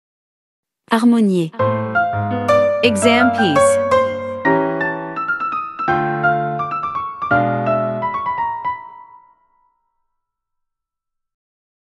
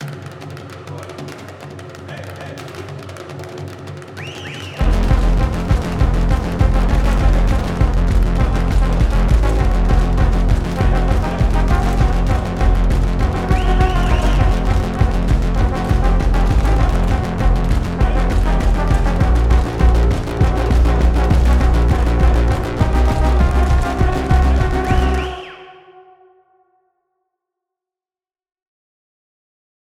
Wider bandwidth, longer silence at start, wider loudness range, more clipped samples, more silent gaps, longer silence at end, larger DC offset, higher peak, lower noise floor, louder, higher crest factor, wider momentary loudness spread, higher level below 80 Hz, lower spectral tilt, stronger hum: about the same, 12 kHz vs 11 kHz; first, 0.9 s vs 0 s; about the same, 10 LU vs 10 LU; neither; neither; second, 2.85 s vs 4.2 s; neither; about the same, 0 dBFS vs 0 dBFS; second, -79 dBFS vs under -90 dBFS; about the same, -17 LUFS vs -17 LUFS; about the same, 18 dB vs 14 dB; second, 8 LU vs 15 LU; second, -54 dBFS vs -16 dBFS; second, -5.5 dB/octave vs -7 dB/octave; neither